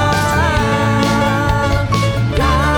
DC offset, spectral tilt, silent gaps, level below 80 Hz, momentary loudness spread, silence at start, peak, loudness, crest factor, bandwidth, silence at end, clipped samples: under 0.1%; -5.5 dB/octave; none; -24 dBFS; 2 LU; 0 s; 0 dBFS; -15 LUFS; 14 dB; 18 kHz; 0 s; under 0.1%